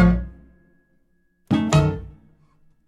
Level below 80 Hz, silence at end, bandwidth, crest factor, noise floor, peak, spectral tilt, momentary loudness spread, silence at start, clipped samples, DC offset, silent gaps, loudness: -34 dBFS; 0.75 s; 11 kHz; 20 dB; -63 dBFS; -4 dBFS; -7 dB/octave; 20 LU; 0 s; under 0.1%; under 0.1%; none; -21 LUFS